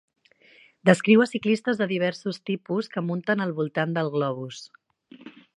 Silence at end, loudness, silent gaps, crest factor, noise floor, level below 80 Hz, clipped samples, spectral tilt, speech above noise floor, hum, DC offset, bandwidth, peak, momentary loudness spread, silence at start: 0.3 s; -24 LUFS; none; 24 dB; -56 dBFS; -74 dBFS; under 0.1%; -6.5 dB/octave; 32 dB; none; under 0.1%; 11 kHz; -2 dBFS; 12 LU; 0.85 s